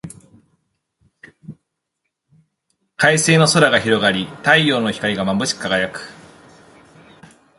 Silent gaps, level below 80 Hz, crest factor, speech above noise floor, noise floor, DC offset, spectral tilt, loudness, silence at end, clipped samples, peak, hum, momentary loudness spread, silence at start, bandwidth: none; -56 dBFS; 20 dB; 61 dB; -77 dBFS; under 0.1%; -4 dB/octave; -16 LUFS; 1.45 s; under 0.1%; 0 dBFS; none; 11 LU; 0.05 s; 11.5 kHz